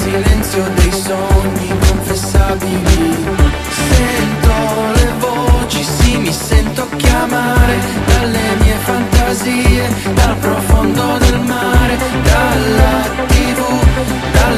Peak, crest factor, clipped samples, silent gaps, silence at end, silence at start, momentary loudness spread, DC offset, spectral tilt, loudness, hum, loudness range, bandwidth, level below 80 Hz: 0 dBFS; 12 dB; under 0.1%; none; 0 s; 0 s; 3 LU; under 0.1%; -5 dB/octave; -13 LUFS; none; 1 LU; 14.5 kHz; -16 dBFS